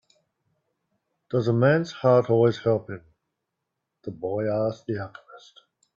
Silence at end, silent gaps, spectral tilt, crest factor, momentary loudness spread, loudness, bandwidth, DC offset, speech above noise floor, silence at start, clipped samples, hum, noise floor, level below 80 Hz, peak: 0.6 s; none; -8 dB/octave; 18 dB; 20 LU; -24 LUFS; 7.2 kHz; under 0.1%; 59 dB; 1.3 s; under 0.1%; none; -82 dBFS; -64 dBFS; -8 dBFS